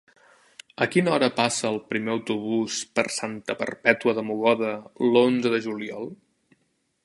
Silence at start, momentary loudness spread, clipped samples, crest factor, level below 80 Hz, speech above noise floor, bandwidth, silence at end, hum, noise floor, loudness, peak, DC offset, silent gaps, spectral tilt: 0.8 s; 10 LU; under 0.1%; 24 dB; -70 dBFS; 47 dB; 11.5 kHz; 0.9 s; none; -71 dBFS; -24 LUFS; -2 dBFS; under 0.1%; none; -4 dB/octave